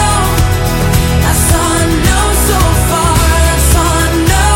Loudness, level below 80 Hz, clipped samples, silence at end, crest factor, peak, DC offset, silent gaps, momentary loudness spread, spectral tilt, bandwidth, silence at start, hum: -10 LUFS; -14 dBFS; under 0.1%; 0 s; 10 dB; 0 dBFS; under 0.1%; none; 2 LU; -4 dB/octave; 17.5 kHz; 0 s; none